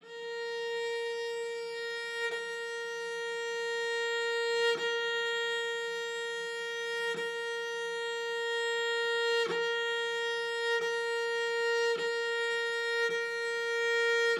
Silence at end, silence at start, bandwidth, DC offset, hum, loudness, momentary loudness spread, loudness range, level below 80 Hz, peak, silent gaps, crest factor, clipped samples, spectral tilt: 0 s; 0.05 s; 13.5 kHz; under 0.1%; none; -32 LUFS; 7 LU; 4 LU; under -90 dBFS; -20 dBFS; none; 14 dB; under 0.1%; 0 dB/octave